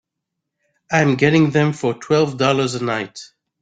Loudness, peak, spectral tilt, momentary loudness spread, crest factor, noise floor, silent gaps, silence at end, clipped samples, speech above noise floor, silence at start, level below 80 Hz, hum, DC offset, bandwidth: -17 LUFS; -2 dBFS; -6 dB/octave; 10 LU; 16 dB; -80 dBFS; none; 0.35 s; under 0.1%; 63 dB; 0.9 s; -56 dBFS; none; under 0.1%; 9.2 kHz